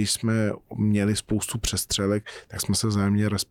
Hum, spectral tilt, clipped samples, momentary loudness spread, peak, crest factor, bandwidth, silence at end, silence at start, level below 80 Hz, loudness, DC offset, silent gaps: none; -4.5 dB/octave; under 0.1%; 6 LU; -12 dBFS; 12 dB; 17.5 kHz; 0.05 s; 0 s; -46 dBFS; -25 LUFS; under 0.1%; none